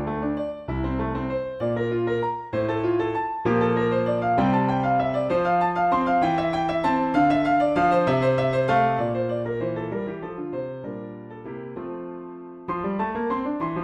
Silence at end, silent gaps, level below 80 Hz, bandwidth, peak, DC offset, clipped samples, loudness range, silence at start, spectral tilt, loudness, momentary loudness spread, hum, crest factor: 0 s; none; -46 dBFS; 9.6 kHz; -8 dBFS; under 0.1%; under 0.1%; 10 LU; 0 s; -8 dB/octave; -24 LUFS; 14 LU; none; 14 dB